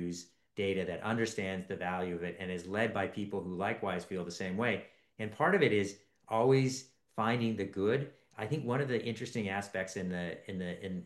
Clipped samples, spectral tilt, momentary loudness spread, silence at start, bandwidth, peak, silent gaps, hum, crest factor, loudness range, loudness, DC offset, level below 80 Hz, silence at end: under 0.1%; -6 dB/octave; 12 LU; 0 s; 12.5 kHz; -14 dBFS; none; none; 20 dB; 4 LU; -35 LUFS; under 0.1%; -76 dBFS; 0 s